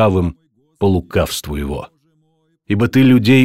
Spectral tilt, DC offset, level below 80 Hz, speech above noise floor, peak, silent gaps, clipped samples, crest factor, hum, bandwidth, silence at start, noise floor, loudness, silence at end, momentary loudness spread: -6.5 dB/octave; under 0.1%; -34 dBFS; 47 dB; -2 dBFS; none; under 0.1%; 14 dB; none; 16 kHz; 0 s; -61 dBFS; -16 LUFS; 0 s; 12 LU